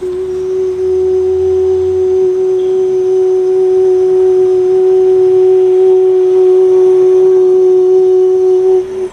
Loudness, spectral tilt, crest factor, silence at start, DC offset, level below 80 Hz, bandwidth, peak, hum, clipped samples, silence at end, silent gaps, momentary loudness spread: -9 LUFS; -7.5 dB/octave; 6 dB; 0 s; under 0.1%; -48 dBFS; 6.6 kHz; -2 dBFS; none; under 0.1%; 0 s; none; 5 LU